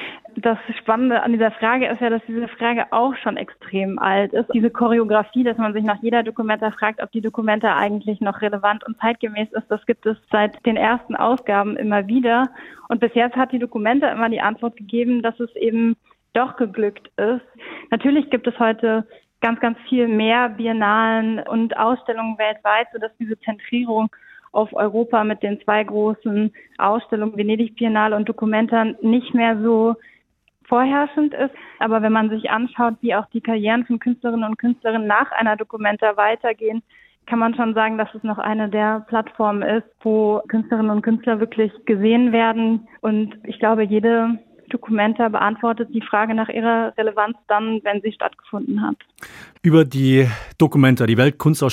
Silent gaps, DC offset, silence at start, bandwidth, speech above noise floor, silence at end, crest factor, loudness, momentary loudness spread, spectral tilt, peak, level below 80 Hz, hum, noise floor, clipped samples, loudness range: none; under 0.1%; 0 s; 14 kHz; 43 dB; 0 s; 18 dB; -19 LUFS; 8 LU; -7 dB/octave; -2 dBFS; -60 dBFS; none; -62 dBFS; under 0.1%; 3 LU